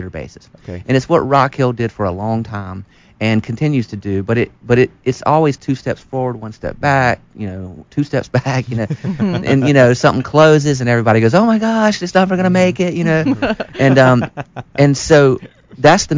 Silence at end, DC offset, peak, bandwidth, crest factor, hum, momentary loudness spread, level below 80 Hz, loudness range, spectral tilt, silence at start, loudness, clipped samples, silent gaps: 0 s; under 0.1%; 0 dBFS; 7.6 kHz; 14 dB; none; 15 LU; -42 dBFS; 6 LU; -6.5 dB/octave; 0 s; -14 LUFS; under 0.1%; none